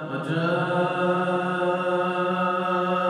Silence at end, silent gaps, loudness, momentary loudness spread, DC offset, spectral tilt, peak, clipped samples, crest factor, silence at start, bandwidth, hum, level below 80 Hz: 0 s; none; -24 LUFS; 1 LU; under 0.1%; -7 dB/octave; -12 dBFS; under 0.1%; 12 dB; 0 s; 11 kHz; none; -72 dBFS